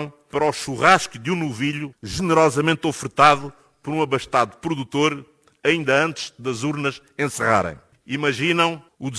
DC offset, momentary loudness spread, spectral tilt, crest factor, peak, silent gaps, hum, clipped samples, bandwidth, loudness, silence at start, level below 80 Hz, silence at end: under 0.1%; 13 LU; -4.5 dB/octave; 20 dB; -2 dBFS; none; none; under 0.1%; 11 kHz; -21 LUFS; 0 s; -52 dBFS; 0 s